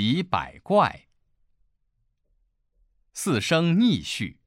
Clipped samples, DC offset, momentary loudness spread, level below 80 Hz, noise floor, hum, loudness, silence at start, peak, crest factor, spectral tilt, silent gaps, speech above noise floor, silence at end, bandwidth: under 0.1%; under 0.1%; 10 LU; -56 dBFS; -72 dBFS; none; -24 LUFS; 0 s; -8 dBFS; 18 dB; -5.5 dB/octave; none; 48 dB; 0.15 s; 16 kHz